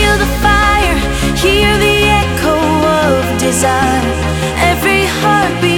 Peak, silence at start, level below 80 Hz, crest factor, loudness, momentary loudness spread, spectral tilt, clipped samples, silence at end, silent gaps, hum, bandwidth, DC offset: 0 dBFS; 0 s; -20 dBFS; 12 dB; -11 LUFS; 4 LU; -4.5 dB/octave; under 0.1%; 0 s; none; none; 18.5 kHz; under 0.1%